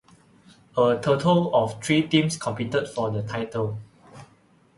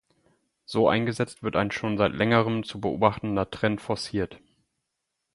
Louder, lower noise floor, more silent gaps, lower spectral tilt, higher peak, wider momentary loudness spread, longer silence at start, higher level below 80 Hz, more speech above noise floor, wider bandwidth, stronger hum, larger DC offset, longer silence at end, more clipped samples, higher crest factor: about the same, -24 LUFS vs -26 LUFS; second, -58 dBFS vs -81 dBFS; neither; about the same, -5.5 dB/octave vs -6.5 dB/octave; about the same, -4 dBFS vs -4 dBFS; about the same, 9 LU vs 8 LU; about the same, 0.75 s vs 0.7 s; about the same, -58 dBFS vs -54 dBFS; second, 35 dB vs 56 dB; about the same, 11.5 kHz vs 11.5 kHz; neither; neither; second, 0.55 s vs 0.95 s; neither; about the same, 20 dB vs 22 dB